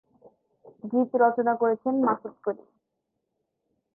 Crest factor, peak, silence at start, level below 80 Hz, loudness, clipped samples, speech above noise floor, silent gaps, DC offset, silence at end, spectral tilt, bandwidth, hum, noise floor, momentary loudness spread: 20 dB; -8 dBFS; 0.85 s; -80 dBFS; -25 LUFS; under 0.1%; 56 dB; none; under 0.1%; 1.4 s; -11.5 dB/octave; 2.3 kHz; none; -81 dBFS; 11 LU